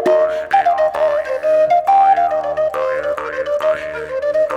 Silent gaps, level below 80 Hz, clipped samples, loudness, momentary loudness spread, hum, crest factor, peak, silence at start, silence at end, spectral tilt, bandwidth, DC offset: none; -52 dBFS; under 0.1%; -16 LUFS; 9 LU; none; 12 dB; -4 dBFS; 0 s; 0 s; -4.5 dB/octave; 12 kHz; under 0.1%